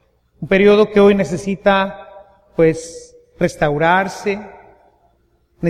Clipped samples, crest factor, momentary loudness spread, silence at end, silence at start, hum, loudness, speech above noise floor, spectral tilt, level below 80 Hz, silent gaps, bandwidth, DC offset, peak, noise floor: under 0.1%; 16 dB; 16 LU; 0 s; 0.4 s; none; -15 LUFS; 44 dB; -6 dB/octave; -44 dBFS; none; 11.5 kHz; under 0.1%; 0 dBFS; -59 dBFS